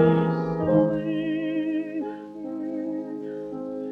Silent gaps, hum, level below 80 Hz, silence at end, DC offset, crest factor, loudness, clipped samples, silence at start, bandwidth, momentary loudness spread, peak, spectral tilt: none; none; -58 dBFS; 0 s; under 0.1%; 18 dB; -27 LUFS; under 0.1%; 0 s; 5 kHz; 12 LU; -8 dBFS; -10 dB/octave